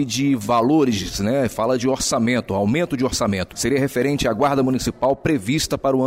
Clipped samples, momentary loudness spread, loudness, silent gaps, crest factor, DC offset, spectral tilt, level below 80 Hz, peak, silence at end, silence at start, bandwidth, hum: under 0.1%; 3 LU; -20 LUFS; none; 12 dB; under 0.1%; -5 dB/octave; -42 dBFS; -8 dBFS; 0 s; 0 s; 16 kHz; none